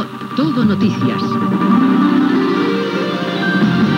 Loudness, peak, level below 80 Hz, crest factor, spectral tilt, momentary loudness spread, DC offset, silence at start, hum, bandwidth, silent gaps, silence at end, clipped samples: -15 LUFS; -2 dBFS; -58 dBFS; 12 dB; -7.5 dB/octave; 6 LU; under 0.1%; 0 s; none; 15 kHz; none; 0 s; under 0.1%